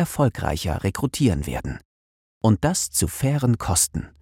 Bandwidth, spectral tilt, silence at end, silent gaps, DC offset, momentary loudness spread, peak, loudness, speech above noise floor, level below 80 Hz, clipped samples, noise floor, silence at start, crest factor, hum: 16.5 kHz; -5 dB/octave; 0.1 s; 1.85-2.41 s; under 0.1%; 8 LU; -6 dBFS; -22 LUFS; over 68 dB; -40 dBFS; under 0.1%; under -90 dBFS; 0 s; 16 dB; none